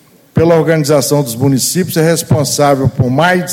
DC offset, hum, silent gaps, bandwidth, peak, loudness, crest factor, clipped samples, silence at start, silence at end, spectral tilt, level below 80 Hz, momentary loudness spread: under 0.1%; none; none; 17 kHz; 0 dBFS; -11 LUFS; 12 dB; under 0.1%; 0.35 s; 0 s; -5 dB/octave; -42 dBFS; 3 LU